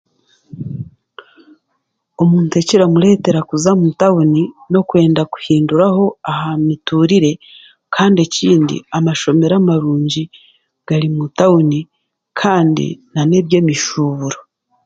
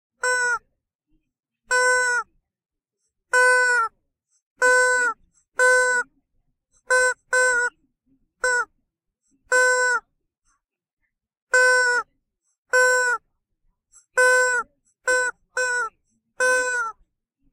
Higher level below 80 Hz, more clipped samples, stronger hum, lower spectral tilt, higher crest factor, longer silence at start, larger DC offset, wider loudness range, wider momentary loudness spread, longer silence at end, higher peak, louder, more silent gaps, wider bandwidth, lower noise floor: first, -54 dBFS vs -62 dBFS; neither; neither; first, -6 dB/octave vs 2 dB/octave; about the same, 14 dB vs 18 dB; first, 0.55 s vs 0.25 s; neither; about the same, 3 LU vs 4 LU; about the same, 10 LU vs 12 LU; second, 0.45 s vs 0.6 s; first, 0 dBFS vs -6 dBFS; first, -14 LUFS vs -20 LUFS; second, none vs 0.95-0.99 s, 4.42-4.56 s, 10.93-10.97 s, 11.42-11.47 s, 12.58-12.65 s; second, 9 kHz vs 15 kHz; second, -69 dBFS vs -79 dBFS